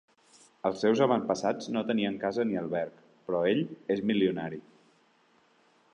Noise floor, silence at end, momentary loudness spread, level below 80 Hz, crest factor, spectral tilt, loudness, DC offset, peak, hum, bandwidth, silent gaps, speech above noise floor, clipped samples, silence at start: -66 dBFS; 1.35 s; 11 LU; -70 dBFS; 20 dB; -6 dB/octave; -30 LUFS; under 0.1%; -12 dBFS; none; 9.8 kHz; none; 37 dB; under 0.1%; 0.65 s